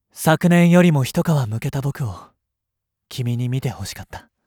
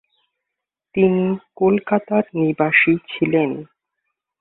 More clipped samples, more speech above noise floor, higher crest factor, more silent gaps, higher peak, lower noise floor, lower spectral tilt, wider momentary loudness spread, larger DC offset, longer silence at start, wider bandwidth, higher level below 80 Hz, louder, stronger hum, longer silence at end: neither; about the same, 63 dB vs 65 dB; about the same, 18 dB vs 18 dB; neither; about the same, -2 dBFS vs -2 dBFS; about the same, -81 dBFS vs -83 dBFS; second, -6.5 dB/octave vs -11.5 dB/octave; first, 20 LU vs 9 LU; neither; second, 0.15 s vs 0.95 s; first, 18.5 kHz vs 4.1 kHz; first, -50 dBFS vs -58 dBFS; about the same, -19 LUFS vs -18 LUFS; neither; second, 0.25 s vs 0.75 s